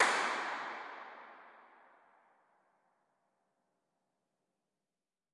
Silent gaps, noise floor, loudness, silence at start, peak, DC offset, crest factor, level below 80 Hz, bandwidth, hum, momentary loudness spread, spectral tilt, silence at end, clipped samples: none; under -90 dBFS; -37 LUFS; 0 s; -14 dBFS; under 0.1%; 28 dB; under -90 dBFS; 11.5 kHz; none; 24 LU; 0 dB/octave; 3.75 s; under 0.1%